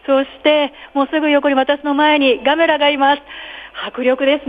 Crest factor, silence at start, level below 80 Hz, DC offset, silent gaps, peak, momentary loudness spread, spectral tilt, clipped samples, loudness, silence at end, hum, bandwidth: 14 dB; 0.1 s; -54 dBFS; under 0.1%; none; -2 dBFS; 13 LU; -5.5 dB/octave; under 0.1%; -15 LUFS; 0 s; none; 5 kHz